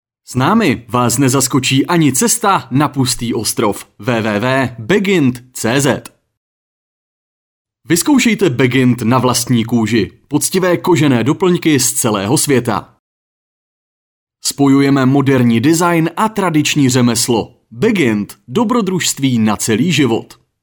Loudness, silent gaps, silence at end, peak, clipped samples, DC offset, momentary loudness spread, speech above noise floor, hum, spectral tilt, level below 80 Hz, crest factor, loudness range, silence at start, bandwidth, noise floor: -13 LUFS; 6.37-7.65 s, 12.99-14.27 s; 0.35 s; 0 dBFS; under 0.1%; under 0.1%; 6 LU; over 77 dB; none; -4.5 dB/octave; -48 dBFS; 14 dB; 4 LU; 0.3 s; over 20 kHz; under -90 dBFS